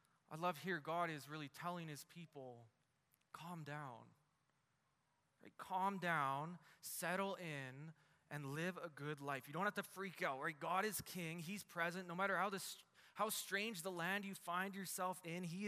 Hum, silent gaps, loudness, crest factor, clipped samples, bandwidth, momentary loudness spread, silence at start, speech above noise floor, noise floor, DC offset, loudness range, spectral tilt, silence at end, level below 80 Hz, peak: none; none; -45 LUFS; 22 dB; under 0.1%; 15.5 kHz; 16 LU; 0.3 s; 38 dB; -84 dBFS; under 0.1%; 10 LU; -4 dB/octave; 0 s; -88 dBFS; -26 dBFS